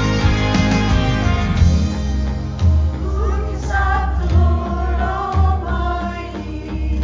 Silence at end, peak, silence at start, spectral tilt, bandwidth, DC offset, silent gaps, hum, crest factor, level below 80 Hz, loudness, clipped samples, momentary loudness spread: 0 s; -2 dBFS; 0 s; -6.5 dB/octave; 7.6 kHz; under 0.1%; none; none; 14 dB; -20 dBFS; -18 LUFS; under 0.1%; 8 LU